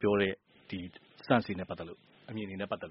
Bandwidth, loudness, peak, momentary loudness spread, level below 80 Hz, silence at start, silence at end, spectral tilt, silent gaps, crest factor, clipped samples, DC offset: 5.8 kHz; -35 LUFS; -10 dBFS; 18 LU; -66 dBFS; 0 s; 0 s; -4.5 dB/octave; none; 24 dB; under 0.1%; under 0.1%